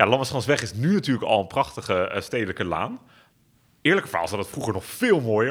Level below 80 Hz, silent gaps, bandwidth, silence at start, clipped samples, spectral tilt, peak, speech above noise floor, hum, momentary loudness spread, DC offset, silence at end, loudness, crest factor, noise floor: -60 dBFS; none; over 20 kHz; 0 s; under 0.1%; -5.5 dB/octave; 0 dBFS; 38 dB; none; 8 LU; under 0.1%; 0 s; -24 LUFS; 24 dB; -61 dBFS